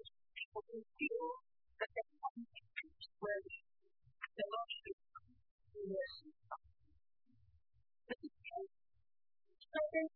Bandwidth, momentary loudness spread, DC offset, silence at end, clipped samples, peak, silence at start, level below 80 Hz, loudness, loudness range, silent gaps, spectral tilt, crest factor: 4 kHz; 13 LU; under 0.1%; 0.05 s; under 0.1%; -28 dBFS; 0.05 s; -80 dBFS; -47 LUFS; 7 LU; 0.45-0.52 s, 2.30-2.35 s, 4.93-4.98 s, 5.51-5.58 s; -2 dB/octave; 20 dB